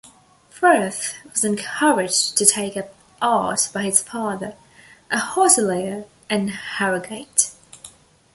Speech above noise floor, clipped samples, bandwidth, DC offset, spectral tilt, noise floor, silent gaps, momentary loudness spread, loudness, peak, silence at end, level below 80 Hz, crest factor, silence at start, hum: 30 dB; under 0.1%; 12 kHz; under 0.1%; -2 dB/octave; -51 dBFS; none; 12 LU; -19 LUFS; 0 dBFS; 0.45 s; -62 dBFS; 22 dB; 0.05 s; none